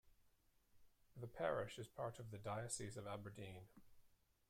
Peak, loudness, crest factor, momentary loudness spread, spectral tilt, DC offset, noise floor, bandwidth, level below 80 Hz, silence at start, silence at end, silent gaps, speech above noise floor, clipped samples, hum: -30 dBFS; -49 LUFS; 22 dB; 14 LU; -4.5 dB/octave; under 0.1%; -77 dBFS; 16 kHz; -74 dBFS; 0.05 s; 0.35 s; none; 28 dB; under 0.1%; none